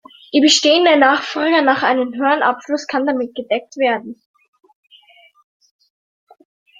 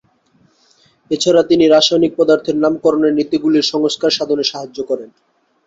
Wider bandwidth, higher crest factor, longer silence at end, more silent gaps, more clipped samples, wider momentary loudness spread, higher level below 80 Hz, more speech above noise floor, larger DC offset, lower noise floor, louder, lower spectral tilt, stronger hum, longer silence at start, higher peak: first, 9.4 kHz vs 8 kHz; about the same, 18 dB vs 14 dB; first, 2.65 s vs 0.6 s; neither; neither; about the same, 11 LU vs 12 LU; second, -68 dBFS vs -58 dBFS; second, 34 dB vs 42 dB; neither; second, -49 dBFS vs -56 dBFS; about the same, -15 LUFS vs -14 LUFS; second, -1.5 dB/octave vs -4 dB/octave; neither; second, 0.35 s vs 1.1 s; about the same, 0 dBFS vs 0 dBFS